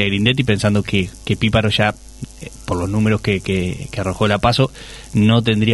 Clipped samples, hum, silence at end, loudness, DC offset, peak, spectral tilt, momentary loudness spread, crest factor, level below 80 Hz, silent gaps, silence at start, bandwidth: under 0.1%; none; 0 s; -17 LUFS; under 0.1%; -2 dBFS; -6 dB/octave; 15 LU; 16 dB; -38 dBFS; none; 0 s; 12 kHz